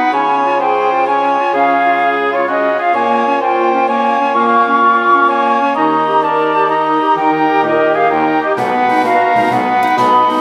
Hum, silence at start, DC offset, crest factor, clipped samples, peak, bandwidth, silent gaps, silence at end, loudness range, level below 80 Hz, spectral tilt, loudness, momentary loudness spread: none; 0 s; under 0.1%; 12 dB; under 0.1%; 0 dBFS; 14 kHz; none; 0 s; 1 LU; -66 dBFS; -5.5 dB/octave; -12 LUFS; 3 LU